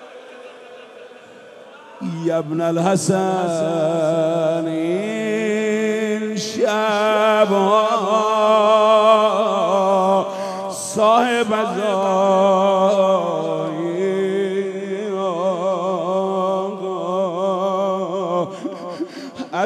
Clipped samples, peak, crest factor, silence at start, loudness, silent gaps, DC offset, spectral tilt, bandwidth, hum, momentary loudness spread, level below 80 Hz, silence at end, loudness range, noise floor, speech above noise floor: under 0.1%; -2 dBFS; 16 dB; 0 s; -18 LUFS; none; under 0.1%; -5 dB/octave; 13.5 kHz; none; 11 LU; -74 dBFS; 0 s; 6 LU; -41 dBFS; 24 dB